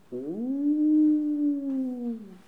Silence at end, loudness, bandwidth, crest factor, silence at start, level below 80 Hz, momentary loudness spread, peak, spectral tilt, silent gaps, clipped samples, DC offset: 0.1 s; -26 LUFS; 1.8 kHz; 10 dB; 0.1 s; -76 dBFS; 12 LU; -16 dBFS; -9.5 dB/octave; none; under 0.1%; 0.1%